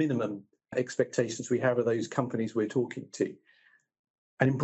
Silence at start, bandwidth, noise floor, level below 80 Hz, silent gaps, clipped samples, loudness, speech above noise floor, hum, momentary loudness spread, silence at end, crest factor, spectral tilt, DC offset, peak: 0 s; 8.2 kHz; -65 dBFS; -74 dBFS; 3.99-4.04 s, 4.10-4.37 s; under 0.1%; -31 LUFS; 35 dB; none; 8 LU; 0 s; 22 dB; -6 dB/octave; under 0.1%; -8 dBFS